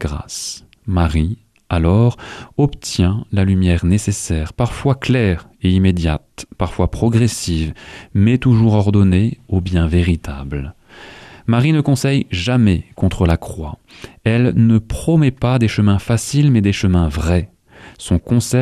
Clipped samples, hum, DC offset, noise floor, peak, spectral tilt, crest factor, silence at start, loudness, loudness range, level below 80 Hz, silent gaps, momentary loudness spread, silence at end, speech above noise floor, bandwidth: under 0.1%; none; under 0.1%; -39 dBFS; -2 dBFS; -6.5 dB/octave; 12 dB; 0 s; -16 LUFS; 3 LU; -30 dBFS; none; 13 LU; 0 s; 23 dB; 13.5 kHz